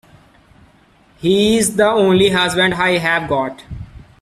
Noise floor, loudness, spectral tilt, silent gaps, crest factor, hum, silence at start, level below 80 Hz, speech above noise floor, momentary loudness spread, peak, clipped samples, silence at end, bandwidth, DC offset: -51 dBFS; -15 LUFS; -4 dB/octave; none; 16 dB; none; 1.2 s; -44 dBFS; 36 dB; 15 LU; -2 dBFS; under 0.1%; 0.2 s; 15 kHz; under 0.1%